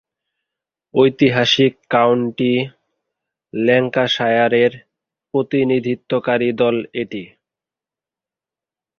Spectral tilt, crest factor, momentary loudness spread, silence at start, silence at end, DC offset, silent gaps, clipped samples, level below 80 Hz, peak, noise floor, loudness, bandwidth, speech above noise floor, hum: -6 dB/octave; 18 dB; 10 LU; 0.95 s; 1.7 s; under 0.1%; none; under 0.1%; -60 dBFS; 0 dBFS; -89 dBFS; -17 LUFS; 7 kHz; 73 dB; none